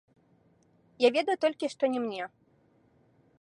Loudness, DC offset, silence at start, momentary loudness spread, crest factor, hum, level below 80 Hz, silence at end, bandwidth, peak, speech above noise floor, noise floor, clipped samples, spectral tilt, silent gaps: -29 LUFS; under 0.1%; 1 s; 12 LU; 22 dB; none; -82 dBFS; 1.15 s; 11 kHz; -10 dBFS; 38 dB; -66 dBFS; under 0.1%; -4 dB/octave; none